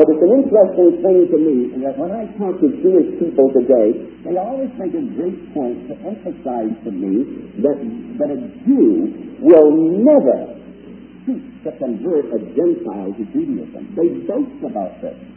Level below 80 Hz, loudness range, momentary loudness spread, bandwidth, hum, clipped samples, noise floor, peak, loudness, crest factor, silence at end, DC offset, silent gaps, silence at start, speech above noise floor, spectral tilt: -54 dBFS; 8 LU; 14 LU; 3.2 kHz; none; under 0.1%; -37 dBFS; 0 dBFS; -16 LUFS; 16 dB; 0.05 s; under 0.1%; none; 0 s; 21 dB; -12 dB/octave